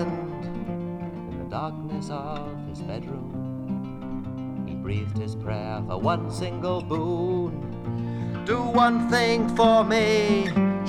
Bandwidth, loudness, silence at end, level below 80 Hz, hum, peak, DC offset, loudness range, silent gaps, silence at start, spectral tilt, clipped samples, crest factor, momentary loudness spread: 13.5 kHz; -26 LUFS; 0 s; -48 dBFS; none; -6 dBFS; under 0.1%; 11 LU; none; 0 s; -6.5 dB/octave; under 0.1%; 20 dB; 13 LU